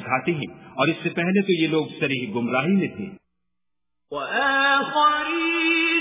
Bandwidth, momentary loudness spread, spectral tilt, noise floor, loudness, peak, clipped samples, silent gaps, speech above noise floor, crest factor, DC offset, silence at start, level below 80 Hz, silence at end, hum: 3.9 kHz; 11 LU; -9.5 dB/octave; -86 dBFS; -21 LUFS; -6 dBFS; under 0.1%; none; 63 dB; 16 dB; under 0.1%; 0 s; -64 dBFS; 0 s; none